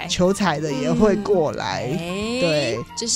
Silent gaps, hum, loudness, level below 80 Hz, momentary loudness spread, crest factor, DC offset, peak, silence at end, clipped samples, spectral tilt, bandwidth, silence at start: none; none; -21 LUFS; -44 dBFS; 7 LU; 16 dB; under 0.1%; -4 dBFS; 0 s; under 0.1%; -4.5 dB/octave; 16 kHz; 0 s